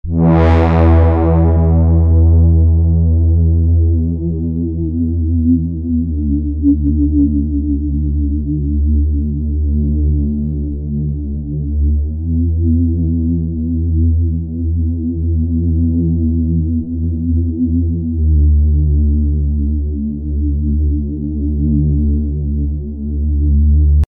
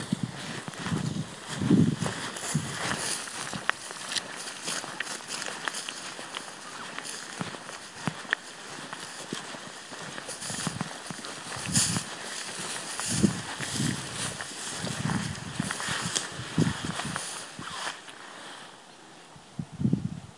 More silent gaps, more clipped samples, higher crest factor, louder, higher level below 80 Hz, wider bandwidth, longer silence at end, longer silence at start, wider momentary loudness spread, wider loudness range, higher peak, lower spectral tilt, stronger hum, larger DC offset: neither; neither; second, 12 dB vs 30 dB; first, -15 LUFS vs -32 LUFS; first, -16 dBFS vs -62 dBFS; second, 3.5 kHz vs 11.5 kHz; about the same, 0.05 s vs 0 s; about the same, 0.05 s vs 0 s; second, 8 LU vs 13 LU; about the same, 5 LU vs 7 LU; first, 0 dBFS vs -4 dBFS; first, -12 dB/octave vs -3.5 dB/octave; neither; neither